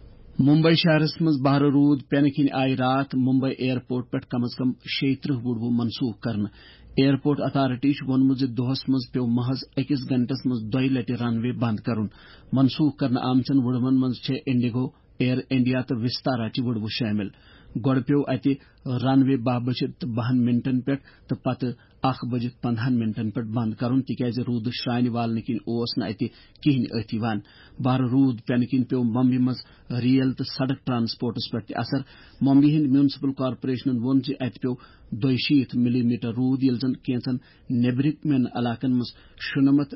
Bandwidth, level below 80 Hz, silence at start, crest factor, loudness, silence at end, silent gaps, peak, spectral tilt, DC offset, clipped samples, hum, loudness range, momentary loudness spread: 5.8 kHz; -56 dBFS; 0 s; 14 dB; -24 LUFS; 0 s; none; -8 dBFS; -11 dB/octave; under 0.1%; under 0.1%; none; 3 LU; 9 LU